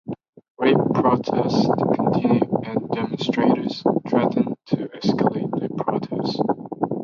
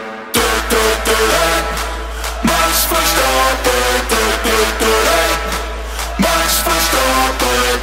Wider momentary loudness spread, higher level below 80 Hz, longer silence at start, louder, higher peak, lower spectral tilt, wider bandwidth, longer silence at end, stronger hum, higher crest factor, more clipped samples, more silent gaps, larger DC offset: about the same, 7 LU vs 9 LU; second, -58 dBFS vs -24 dBFS; about the same, 0.05 s vs 0 s; second, -22 LUFS vs -14 LUFS; second, -6 dBFS vs 0 dBFS; first, -7.5 dB/octave vs -2.5 dB/octave; second, 7.2 kHz vs 16.5 kHz; about the same, 0 s vs 0 s; neither; about the same, 16 dB vs 14 dB; neither; first, 0.29-0.33 s, 0.50-0.55 s vs none; neither